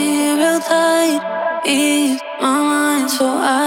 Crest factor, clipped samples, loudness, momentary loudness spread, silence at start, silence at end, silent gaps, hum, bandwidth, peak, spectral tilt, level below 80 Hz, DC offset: 14 dB; under 0.1%; -16 LUFS; 5 LU; 0 s; 0 s; none; none; 17 kHz; -2 dBFS; -2 dB/octave; -68 dBFS; under 0.1%